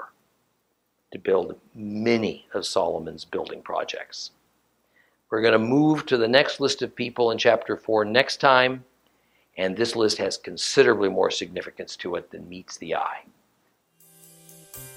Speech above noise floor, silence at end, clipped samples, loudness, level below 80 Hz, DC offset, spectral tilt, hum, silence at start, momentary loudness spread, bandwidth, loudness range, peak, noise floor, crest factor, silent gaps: 49 dB; 0 s; under 0.1%; -23 LUFS; -66 dBFS; under 0.1%; -4 dB/octave; none; 0 s; 18 LU; 16 kHz; 8 LU; 0 dBFS; -72 dBFS; 24 dB; none